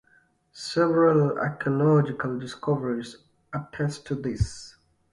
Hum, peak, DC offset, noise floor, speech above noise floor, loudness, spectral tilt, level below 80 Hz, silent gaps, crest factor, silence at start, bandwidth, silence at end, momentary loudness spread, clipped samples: none; -8 dBFS; under 0.1%; -63 dBFS; 38 dB; -25 LUFS; -7 dB/octave; -46 dBFS; none; 18 dB; 0.55 s; 11.5 kHz; 0.45 s; 15 LU; under 0.1%